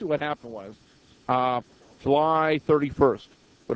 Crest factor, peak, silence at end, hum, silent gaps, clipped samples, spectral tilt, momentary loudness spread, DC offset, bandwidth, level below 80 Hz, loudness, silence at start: 22 dB; -4 dBFS; 0 s; none; none; under 0.1%; -7.5 dB/octave; 19 LU; under 0.1%; 8 kHz; -52 dBFS; -24 LUFS; 0 s